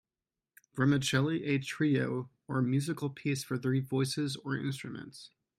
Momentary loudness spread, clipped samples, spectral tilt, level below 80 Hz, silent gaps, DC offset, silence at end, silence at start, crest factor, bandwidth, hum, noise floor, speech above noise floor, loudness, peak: 13 LU; under 0.1%; -5.5 dB/octave; -70 dBFS; none; under 0.1%; 0.3 s; 0.75 s; 18 dB; 14.5 kHz; none; under -90 dBFS; over 58 dB; -32 LUFS; -14 dBFS